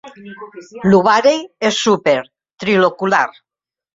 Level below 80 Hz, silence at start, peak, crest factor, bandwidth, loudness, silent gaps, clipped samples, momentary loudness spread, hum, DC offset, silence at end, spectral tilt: -56 dBFS; 0.05 s; 0 dBFS; 16 dB; 7.8 kHz; -15 LUFS; 2.53-2.57 s; under 0.1%; 22 LU; none; under 0.1%; 0.65 s; -4.5 dB/octave